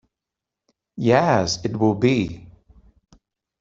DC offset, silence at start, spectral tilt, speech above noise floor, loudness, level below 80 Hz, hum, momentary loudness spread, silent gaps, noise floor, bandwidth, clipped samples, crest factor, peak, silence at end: under 0.1%; 0.95 s; -5.5 dB/octave; 67 dB; -20 LUFS; -52 dBFS; none; 16 LU; none; -86 dBFS; 7.8 kHz; under 0.1%; 20 dB; -2 dBFS; 1.15 s